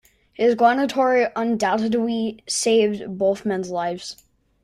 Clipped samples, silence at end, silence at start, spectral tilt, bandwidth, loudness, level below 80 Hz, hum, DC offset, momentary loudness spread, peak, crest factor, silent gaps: under 0.1%; 0.5 s; 0.4 s; -4 dB/octave; 15 kHz; -21 LUFS; -62 dBFS; none; under 0.1%; 8 LU; -4 dBFS; 16 dB; none